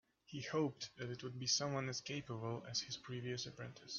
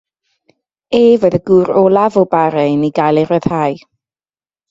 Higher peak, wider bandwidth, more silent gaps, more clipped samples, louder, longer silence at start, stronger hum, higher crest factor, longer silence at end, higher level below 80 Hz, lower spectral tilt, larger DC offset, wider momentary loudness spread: second, -24 dBFS vs 0 dBFS; about the same, 7.4 kHz vs 7.8 kHz; neither; neither; second, -42 LUFS vs -12 LUFS; second, 0.3 s vs 0.9 s; neither; first, 20 dB vs 14 dB; second, 0 s vs 0.95 s; second, -76 dBFS vs -50 dBFS; second, -4 dB/octave vs -8 dB/octave; neither; first, 11 LU vs 7 LU